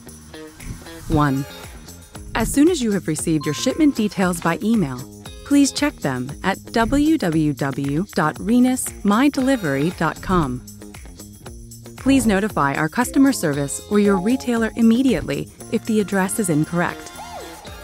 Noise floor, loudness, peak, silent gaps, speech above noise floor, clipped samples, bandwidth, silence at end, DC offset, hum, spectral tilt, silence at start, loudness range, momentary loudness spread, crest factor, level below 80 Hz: -39 dBFS; -19 LUFS; -6 dBFS; none; 20 dB; under 0.1%; 16 kHz; 0 s; under 0.1%; none; -5 dB/octave; 0 s; 3 LU; 21 LU; 14 dB; -40 dBFS